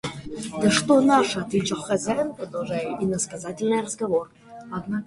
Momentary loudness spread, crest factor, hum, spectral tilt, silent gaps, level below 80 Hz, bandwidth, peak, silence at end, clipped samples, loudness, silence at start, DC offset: 15 LU; 18 dB; none; -4.5 dB/octave; none; -56 dBFS; 11.5 kHz; -6 dBFS; 0 s; under 0.1%; -24 LUFS; 0.05 s; under 0.1%